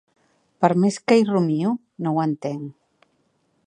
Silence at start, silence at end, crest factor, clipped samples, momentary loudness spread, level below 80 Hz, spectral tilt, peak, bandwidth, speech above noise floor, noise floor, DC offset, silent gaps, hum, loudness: 0.6 s; 0.95 s; 22 dB; under 0.1%; 12 LU; -72 dBFS; -7 dB/octave; -2 dBFS; 10 kHz; 47 dB; -67 dBFS; under 0.1%; none; none; -21 LUFS